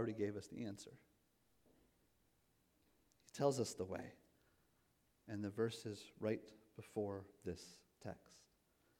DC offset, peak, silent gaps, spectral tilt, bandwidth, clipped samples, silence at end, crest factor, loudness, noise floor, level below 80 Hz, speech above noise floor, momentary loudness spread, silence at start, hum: under 0.1%; -24 dBFS; none; -5.5 dB/octave; 18 kHz; under 0.1%; 0.6 s; 24 dB; -46 LUFS; -79 dBFS; -78 dBFS; 34 dB; 18 LU; 0 s; none